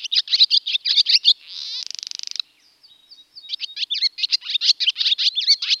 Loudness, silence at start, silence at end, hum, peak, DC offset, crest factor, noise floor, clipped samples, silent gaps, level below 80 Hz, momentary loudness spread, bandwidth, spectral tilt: -17 LUFS; 0 s; 0 s; none; -2 dBFS; under 0.1%; 20 dB; -55 dBFS; under 0.1%; none; -84 dBFS; 15 LU; 15 kHz; 6.5 dB/octave